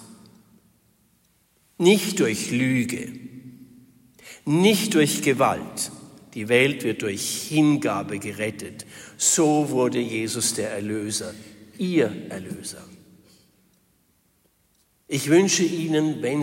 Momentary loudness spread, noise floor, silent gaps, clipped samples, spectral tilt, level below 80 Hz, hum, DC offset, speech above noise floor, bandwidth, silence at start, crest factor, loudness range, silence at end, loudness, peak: 18 LU; -65 dBFS; none; under 0.1%; -4 dB/octave; -66 dBFS; none; under 0.1%; 42 dB; 16.5 kHz; 0 s; 20 dB; 8 LU; 0 s; -22 LUFS; -4 dBFS